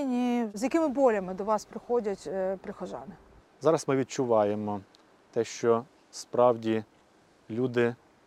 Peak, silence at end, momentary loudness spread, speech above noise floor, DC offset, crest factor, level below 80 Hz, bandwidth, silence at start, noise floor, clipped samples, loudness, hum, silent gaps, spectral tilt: -10 dBFS; 0.3 s; 14 LU; 34 dB; under 0.1%; 20 dB; -66 dBFS; 13 kHz; 0 s; -61 dBFS; under 0.1%; -29 LUFS; none; none; -6 dB/octave